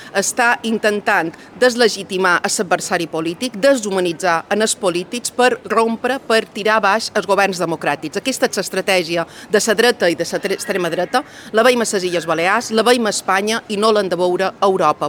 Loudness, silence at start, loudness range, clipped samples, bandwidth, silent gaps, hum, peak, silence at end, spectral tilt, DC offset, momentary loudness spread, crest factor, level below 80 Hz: -17 LUFS; 0 s; 1 LU; under 0.1%; 19.5 kHz; none; none; -2 dBFS; 0 s; -3 dB/octave; under 0.1%; 6 LU; 16 dB; -60 dBFS